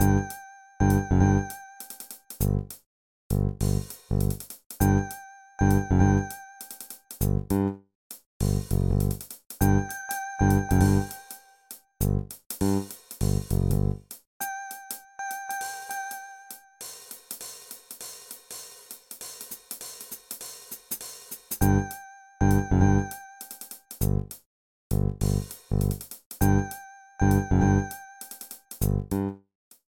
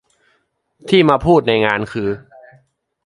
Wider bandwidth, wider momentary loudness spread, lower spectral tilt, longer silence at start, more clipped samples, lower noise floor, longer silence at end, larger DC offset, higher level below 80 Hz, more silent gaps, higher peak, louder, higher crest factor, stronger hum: first, 19 kHz vs 11.5 kHz; first, 19 LU vs 14 LU; about the same, -6.5 dB/octave vs -7 dB/octave; second, 0 s vs 0.85 s; neither; second, -49 dBFS vs -64 dBFS; second, 0.6 s vs 0.85 s; neither; first, -36 dBFS vs -44 dBFS; first, 2.86-3.30 s, 4.66-4.70 s, 7.95-8.10 s, 8.26-8.40 s, 12.46-12.50 s, 14.27-14.40 s, 24.46-24.90 s, 26.26-26.31 s vs none; second, -8 dBFS vs 0 dBFS; second, -27 LUFS vs -15 LUFS; about the same, 18 dB vs 18 dB; neither